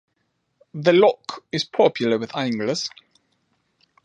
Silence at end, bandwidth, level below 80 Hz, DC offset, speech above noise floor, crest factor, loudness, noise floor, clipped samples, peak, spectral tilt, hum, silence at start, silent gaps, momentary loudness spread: 1.15 s; 9.4 kHz; -68 dBFS; under 0.1%; 52 dB; 20 dB; -21 LUFS; -72 dBFS; under 0.1%; -4 dBFS; -5 dB/octave; none; 0.75 s; none; 14 LU